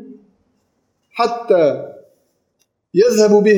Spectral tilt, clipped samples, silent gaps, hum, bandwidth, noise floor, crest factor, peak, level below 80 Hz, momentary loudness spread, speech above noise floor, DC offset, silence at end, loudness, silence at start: -5.5 dB/octave; under 0.1%; none; none; 15.5 kHz; -67 dBFS; 16 dB; -2 dBFS; -70 dBFS; 18 LU; 54 dB; under 0.1%; 0 s; -15 LUFS; 0 s